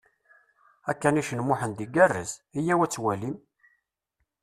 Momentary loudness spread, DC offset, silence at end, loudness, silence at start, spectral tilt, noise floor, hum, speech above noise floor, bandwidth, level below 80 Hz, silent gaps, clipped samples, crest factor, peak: 13 LU; under 0.1%; 1.05 s; -26 LUFS; 0.85 s; -5.5 dB/octave; -79 dBFS; none; 53 dB; 14 kHz; -64 dBFS; none; under 0.1%; 22 dB; -6 dBFS